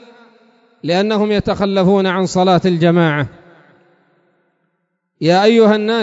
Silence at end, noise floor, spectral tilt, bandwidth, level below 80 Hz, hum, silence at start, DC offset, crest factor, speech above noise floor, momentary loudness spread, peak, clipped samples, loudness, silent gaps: 0 s; -69 dBFS; -6.5 dB/octave; 7.8 kHz; -46 dBFS; none; 0.85 s; under 0.1%; 16 dB; 56 dB; 8 LU; 0 dBFS; under 0.1%; -14 LUFS; none